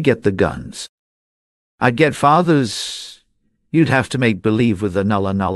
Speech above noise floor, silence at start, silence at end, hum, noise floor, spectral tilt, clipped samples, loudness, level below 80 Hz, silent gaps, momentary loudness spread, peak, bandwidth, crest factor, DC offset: 48 dB; 0 s; 0 s; none; -65 dBFS; -6 dB/octave; under 0.1%; -17 LUFS; -46 dBFS; 0.89-1.78 s; 16 LU; -2 dBFS; 12.5 kHz; 16 dB; under 0.1%